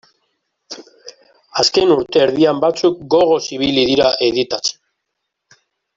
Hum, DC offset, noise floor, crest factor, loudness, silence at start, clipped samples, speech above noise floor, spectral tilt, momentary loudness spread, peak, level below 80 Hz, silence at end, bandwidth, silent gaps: none; under 0.1%; -76 dBFS; 16 dB; -15 LUFS; 0.7 s; under 0.1%; 61 dB; -4 dB/octave; 13 LU; -2 dBFS; -52 dBFS; 1.25 s; 7.8 kHz; none